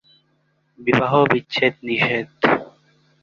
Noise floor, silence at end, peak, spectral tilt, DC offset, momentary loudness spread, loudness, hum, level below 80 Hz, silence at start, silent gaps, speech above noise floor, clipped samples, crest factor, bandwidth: -65 dBFS; 0.55 s; -2 dBFS; -6.5 dB/octave; under 0.1%; 4 LU; -19 LUFS; none; -58 dBFS; 0.8 s; none; 46 dB; under 0.1%; 20 dB; 7.2 kHz